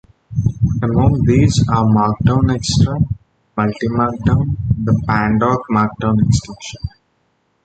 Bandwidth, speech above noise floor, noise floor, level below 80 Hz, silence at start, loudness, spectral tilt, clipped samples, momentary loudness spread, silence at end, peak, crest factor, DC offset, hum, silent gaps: 9.2 kHz; 48 dB; -63 dBFS; -30 dBFS; 0.3 s; -16 LUFS; -7 dB/octave; under 0.1%; 13 LU; 0.75 s; -2 dBFS; 14 dB; under 0.1%; none; none